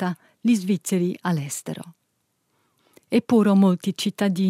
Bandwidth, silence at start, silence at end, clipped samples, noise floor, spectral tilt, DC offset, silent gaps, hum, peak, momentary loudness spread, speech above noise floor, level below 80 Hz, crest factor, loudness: 15.5 kHz; 0 s; 0 s; under 0.1%; -72 dBFS; -6 dB/octave; under 0.1%; none; none; -8 dBFS; 12 LU; 51 dB; -74 dBFS; 16 dB; -22 LUFS